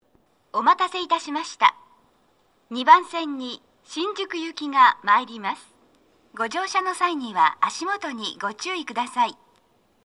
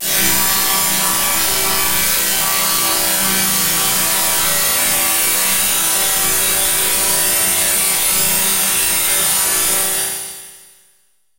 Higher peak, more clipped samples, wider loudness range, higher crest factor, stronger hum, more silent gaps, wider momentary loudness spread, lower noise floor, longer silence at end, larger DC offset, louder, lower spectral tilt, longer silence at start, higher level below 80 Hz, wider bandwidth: about the same, -2 dBFS vs -2 dBFS; neither; first, 4 LU vs 1 LU; first, 22 dB vs 14 dB; neither; neither; first, 14 LU vs 1 LU; first, -63 dBFS vs -59 dBFS; about the same, 0.7 s vs 0.8 s; neither; second, -22 LUFS vs -12 LUFS; first, -2 dB/octave vs 0 dB/octave; first, 0.55 s vs 0 s; second, -76 dBFS vs -44 dBFS; second, 11.5 kHz vs 16.5 kHz